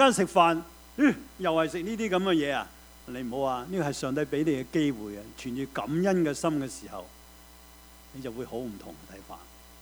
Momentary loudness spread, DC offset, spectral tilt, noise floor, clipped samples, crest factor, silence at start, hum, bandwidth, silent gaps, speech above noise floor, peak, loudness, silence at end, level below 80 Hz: 20 LU; under 0.1%; -5 dB/octave; -52 dBFS; under 0.1%; 22 dB; 0 s; none; over 20 kHz; none; 23 dB; -6 dBFS; -28 LUFS; 0 s; -56 dBFS